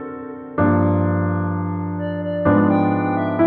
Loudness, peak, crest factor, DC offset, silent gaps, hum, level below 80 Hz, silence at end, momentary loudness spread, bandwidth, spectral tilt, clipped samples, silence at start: -19 LUFS; -4 dBFS; 16 dB; under 0.1%; none; none; -50 dBFS; 0 s; 9 LU; 4.2 kHz; -13 dB/octave; under 0.1%; 0 s